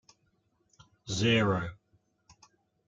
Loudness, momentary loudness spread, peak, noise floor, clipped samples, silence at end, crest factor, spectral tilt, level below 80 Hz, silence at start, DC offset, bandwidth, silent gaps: -29 LUFS; 17 LU; -14 dBFS; -73 dBFS; under 0.1%; 1.15 s; 20 dB; -5 dB/octave; -62 dBFS; 1.05 s; under 0.1%; 9 kHz; none